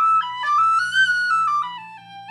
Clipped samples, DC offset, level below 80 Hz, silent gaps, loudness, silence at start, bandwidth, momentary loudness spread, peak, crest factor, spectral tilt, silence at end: under 0.1%; under 0.1%; -86 dBFS; none; -18 LUFS; 0 s; 11.5 kHz; 19 LU; -8 dBFS; 12 dB; 0.5 dB/octave; 0 s